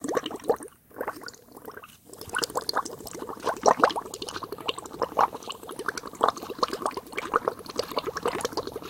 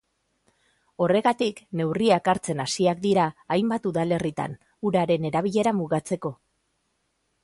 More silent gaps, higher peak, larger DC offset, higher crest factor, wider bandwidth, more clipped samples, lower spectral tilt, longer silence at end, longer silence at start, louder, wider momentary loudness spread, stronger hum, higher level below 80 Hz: neither; first, 0 dBFS vs -6 dBFS; neither; first, 30 dB vs 18 dB; first, 17 kHz vs 11.5 kHz; neither; second, -2.5 dB/octave vs -5.5 dB/octave; second, 0 s vs 1.1 s; second, 0 s vs 1 s; second, -29 LUFS vs -24 LUFS; first, 18 LU vs 9 LU; neither; about the same, -60 dBFS vs -62 dBFS